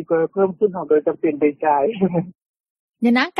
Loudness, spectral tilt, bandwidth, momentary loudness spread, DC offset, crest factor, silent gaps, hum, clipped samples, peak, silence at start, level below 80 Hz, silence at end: -19 LUFS; -8 dB/octave; 6.2 kHz; 4 LU; under 0.1%; 16 dB; 2.35-2.39 s, 2.49-2.54 s, 2.60-2.64 s, 2.70-2.94 s; none; under 0.1%; -4 dBFS; 0 s; -64 dBFS; 0 s